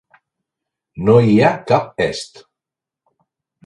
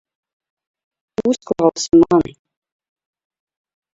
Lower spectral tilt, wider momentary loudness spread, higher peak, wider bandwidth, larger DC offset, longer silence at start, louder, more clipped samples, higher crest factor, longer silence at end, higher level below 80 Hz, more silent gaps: first, -7 dB/octave vs -5.5 dB/octave; about the same, 14 LU vs 13 LU; about the same, 0 dBFS vs -2 dBFS; first, 11 kHz vs 7.8 kHz; neither; second, 0.95 s vs 1.2 s; about the same, -15 LUFS vs -16 LUFS; neither; about the same, 18 dB vs 18 dB; second, 1.4 s vs 1.75 s; about the same, -50 dBFS vs -52 dBFS; neither